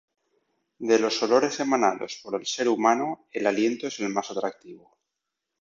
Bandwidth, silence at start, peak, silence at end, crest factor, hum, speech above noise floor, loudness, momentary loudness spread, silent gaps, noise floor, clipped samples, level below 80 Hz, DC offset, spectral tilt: 7.8 kHz; 0.8 s; -6 dBFS; 0.85 s; 20 dB; none; 59 dB; -25 LUFS; 10 LU; none; -84 dBFS; under 0.1%; -74 dBFS; under 0.1%; -3.5 dB/octave